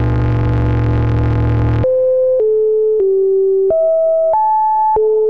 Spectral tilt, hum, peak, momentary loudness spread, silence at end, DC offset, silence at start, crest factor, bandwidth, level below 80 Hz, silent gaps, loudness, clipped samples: -10.5 dB/octave; none; -6 dBFS; 2 LU; 0 s; 1%; 0 s; 6 dB; 4.7 kHz; -24 dBFS; none; -14 LUFS; under 0.1%